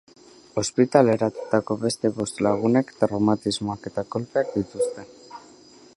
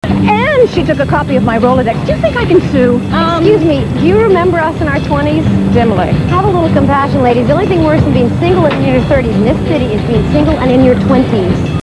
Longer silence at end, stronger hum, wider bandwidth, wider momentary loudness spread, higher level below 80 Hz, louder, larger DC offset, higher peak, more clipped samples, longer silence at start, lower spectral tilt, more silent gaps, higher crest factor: first, 0.55 s vs 0 s; neither; about the same, 12 kHz vs 11 kHz; first, 13 LU vs 4 LU; second, -58 dBFS vs -26 dBFS; second, -23 LUFS vs -10 LUFS; second, under 0.1% vs 0.4%; about the same, -2 dBFS vs 0 dBFS; second, under 0.1% vs 0.3%; first, 0.55 s vs 0 s; second, -5.5 dB/octave vs -8 dB/octave; neither; first, 22 dB vs 10 dB